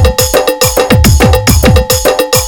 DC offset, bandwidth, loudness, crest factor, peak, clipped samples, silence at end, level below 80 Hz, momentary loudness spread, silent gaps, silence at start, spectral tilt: under 0.1%; 18.5 kHz; -8 LUFS; 8 dB; 0 dBFS; 0.5%; 0 s; -14 dBFS; 3 LU; none; 0 s; -4 dB/octave